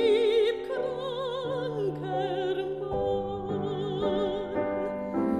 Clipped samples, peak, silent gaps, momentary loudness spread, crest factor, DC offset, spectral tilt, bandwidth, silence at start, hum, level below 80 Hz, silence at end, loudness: under 0.1%; -12 dBFS; none; 7 LU; 16 dB; under 0.1%; -7 dB/octave; 10 kHz; 0 s; none; -54 dBFS; 0 s; -30 LUFS